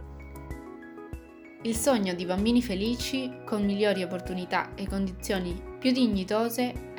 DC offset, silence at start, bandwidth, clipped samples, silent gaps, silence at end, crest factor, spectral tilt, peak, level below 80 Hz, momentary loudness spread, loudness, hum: under 0.1%; 0 s; over 20 kHz; under 0.1%; none; 0 s; 18 dB; -5 dB/octave; -12 dBFS; -46 dBFS; 18 LU; -28 LUFS; none